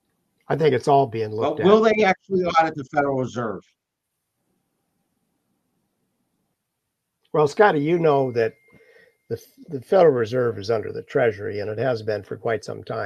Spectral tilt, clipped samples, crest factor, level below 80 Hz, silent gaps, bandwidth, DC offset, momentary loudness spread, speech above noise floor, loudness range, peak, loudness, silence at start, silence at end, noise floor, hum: -6.5 dB/octave; under 0.1%; 20 dB; -64 dBFS; none; 12.5 kHz; under 0.1%; 13 LU; 59 dB; 10 LU; -2 dBFS; -21 LUFS; 0.5 s; 0 s; -80 dBFS; none